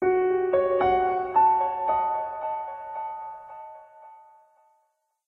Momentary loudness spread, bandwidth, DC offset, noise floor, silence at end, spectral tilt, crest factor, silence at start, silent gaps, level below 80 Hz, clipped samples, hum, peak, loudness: 19 LU; 4 kHz; under 0.1%; -72 dBFS; 1.1 s; -8.5 dB/octave; 14 dB; 0 s; none; -58 dBFS; under 0.1%; none; -12 dBFS; -25 LUFS